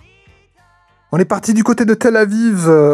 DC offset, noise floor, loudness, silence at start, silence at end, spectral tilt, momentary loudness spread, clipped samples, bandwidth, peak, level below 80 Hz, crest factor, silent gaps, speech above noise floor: under 0.1%; -53 dBFS; -13 LUFS; 1.1 s; 0 s; -6.5 dB/octave; 5 LU; under 0.1%; 13.5 kHz; 0 dBFS; -56 dBFS; 14 dB; none; 42 dB